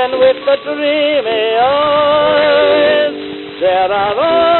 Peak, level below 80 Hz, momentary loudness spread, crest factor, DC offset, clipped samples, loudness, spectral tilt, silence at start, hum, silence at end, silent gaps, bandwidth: 0 dBFS; -48 dBFS; 5 LU; 12 dB; under 0.1%; under 0.1%; -12 LUFS; -1 dB/octave; 0 s; none; 0 s; none; 4.3 kHz